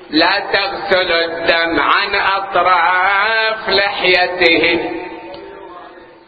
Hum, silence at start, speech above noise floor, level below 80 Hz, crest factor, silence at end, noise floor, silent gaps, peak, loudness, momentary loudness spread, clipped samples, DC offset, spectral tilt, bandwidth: none; 0 s; 23 dB; -48 dBFS; 16 dB; 0.2 s; -37 dBFS; none; 0 dBFS; -13 LUFS; 16 LU; under 0.1%; under 0.1%; -5 dB/octave; 8 kHz